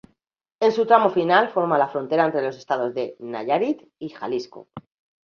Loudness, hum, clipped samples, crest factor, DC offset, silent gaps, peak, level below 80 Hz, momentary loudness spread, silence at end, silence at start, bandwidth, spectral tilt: -22 LUFS; none; under 0.1%; 20 dB; under 0.1%; none; -2 dBFS; -68 dBFS; 14 LU; 0.45 s; 0.6 s; 6.8 kHz; -6 dB/octave